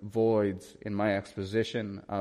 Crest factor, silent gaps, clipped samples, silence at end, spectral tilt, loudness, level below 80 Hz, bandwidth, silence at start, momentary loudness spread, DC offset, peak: 14 dB; none; under 0.1%; 0 s; -7 dB/octave; -31 LUFS; -66 dBFS; 12.5 kHz; 0 s; 10 LU; under 0.1%; -16 dBFS